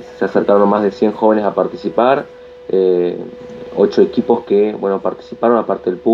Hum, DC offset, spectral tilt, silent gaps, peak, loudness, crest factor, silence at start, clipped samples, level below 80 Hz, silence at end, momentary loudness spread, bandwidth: none; under 0.1%; -8 dB/octave; none; 0 dBFS; -15 LUFS; 14 dB; 0 s; under 0.1%; -54 dBFS; 0 s; 11 LU; 7.2 kHz